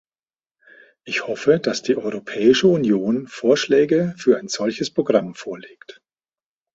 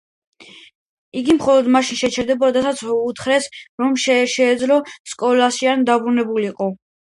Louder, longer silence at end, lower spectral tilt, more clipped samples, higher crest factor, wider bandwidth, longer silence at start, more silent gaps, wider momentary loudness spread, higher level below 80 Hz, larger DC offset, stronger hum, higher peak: about the same, -19 LUFS vs -17 LUFS; first, 1.1 s vs 0.25 s; first, -5 dB/octave vs -3.5 dB/octave; neither; about the same, 18 dB vs 16 dB; second, 8 kHz vs 11.5 kHz; first, 1.05 s vs 0.4 s; second, none vs 0.75-1.12 s, 3.69-3.78 s, 5.00-5.05 s; about the same, 10 LU vs 9 LU; second, -62 dBFS vs -56 dBFS; neither; neither; about the same, -2 dBFS vs -2 dBFS